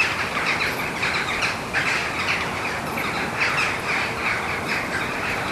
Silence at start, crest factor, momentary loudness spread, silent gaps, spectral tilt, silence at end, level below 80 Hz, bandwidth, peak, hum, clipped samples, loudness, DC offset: 0 s; 16 dB; 4 LU; none; -3 dB/octave; 0 s; -48 dBFS; 13.5 kHz; -8 dBFS; none; under 0.1%; -22 LUFS; under 0.1%